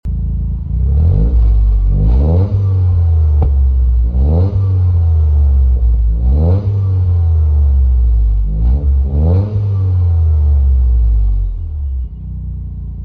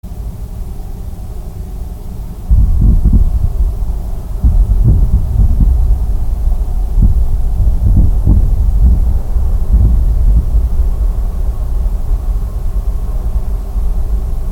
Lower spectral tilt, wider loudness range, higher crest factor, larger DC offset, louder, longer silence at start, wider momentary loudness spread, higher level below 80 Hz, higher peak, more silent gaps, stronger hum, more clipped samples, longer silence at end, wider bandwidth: first, -12 dB/octave vs -9 dB/octave; second, 1 LU vs 5 LU; about the same, 8 dB vs 10 dB; neither; about the same, -14 LUFS vs -15 LUFS; about the same, 0.05 s vs 0.05 s; second, 8 LU vs 15 LU; about the same, -12 dBFS vs -12 dBFS; second, -4 dBFS vs 0 dBFS; neither; neither; neither; about the same, 0 s vs 0 s; second, 1.5 kHz vs 1.9 kHz